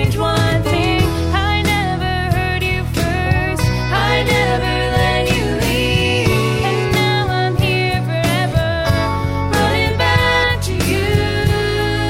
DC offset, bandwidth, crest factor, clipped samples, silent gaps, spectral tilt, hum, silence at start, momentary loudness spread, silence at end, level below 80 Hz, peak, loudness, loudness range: 0.3%; 16 kHz; 14 dB; under 0.1%; none; -5.5 dB/octave; none; 0 s; 3 LU; 0 s; -28 dBFS; -2 dBFS; -16 LUFS; 1 LU